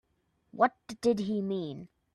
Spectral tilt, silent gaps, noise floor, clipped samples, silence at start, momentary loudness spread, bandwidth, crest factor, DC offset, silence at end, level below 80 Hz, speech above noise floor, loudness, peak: -6.5 dB/octave; none; -74 dBFS; under 0.1%; 0.55 s; 15 LU; 12 kHz; 22 dB; under 0.1%; 0.3 s; -70 dBFS; 44 dB; -31 LUFS; -10 dBFS